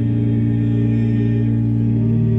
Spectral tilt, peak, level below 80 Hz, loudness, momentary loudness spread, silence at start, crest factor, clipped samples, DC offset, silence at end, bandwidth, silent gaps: -11.5 dB/octave; -6 dBFS; -36 dBFS; -17 LUFS; 1 LU; 0 s; 10 dB; under 0.1%; under 0.1%; 0 s; 3.7 kHz; none